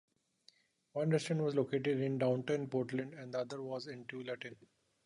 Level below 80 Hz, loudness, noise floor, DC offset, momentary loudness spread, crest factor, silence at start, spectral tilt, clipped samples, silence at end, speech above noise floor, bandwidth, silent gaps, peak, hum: -80 dBFS; -37 LUFS; -70 dBFS; under 0.1%; 11 LU; 18 dB; 0.95 s; -6.5 dB/octave; under 0.1%; 0.5 s; 33 dB; 11 kHz; none; -20 dBFS; none